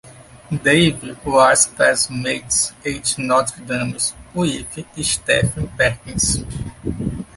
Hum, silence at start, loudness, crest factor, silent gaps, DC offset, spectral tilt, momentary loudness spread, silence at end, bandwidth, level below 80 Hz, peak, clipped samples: none; 0.05 s; -18 LUFS; 18 dB; none; under 0.1%; -3 dB/octave; 13 LU; 0.15 s; 12 kHz; -38 dBFS; -2 dBFS; under 0.1%